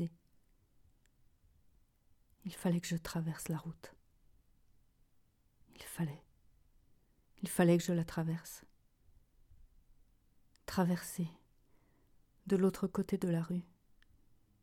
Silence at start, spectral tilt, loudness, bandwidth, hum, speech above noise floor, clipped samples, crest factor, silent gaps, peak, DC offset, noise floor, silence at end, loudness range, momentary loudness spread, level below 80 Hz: 0 s; -6.5 dB/octave; -36 LUFS; 17 kHz; none; 36 dB; under 0.1%; 24 dB; none; -16 dBFS; under 0.1%; -72 dBFS; 1 s; 10 LU; 19 LU; -66 dBFS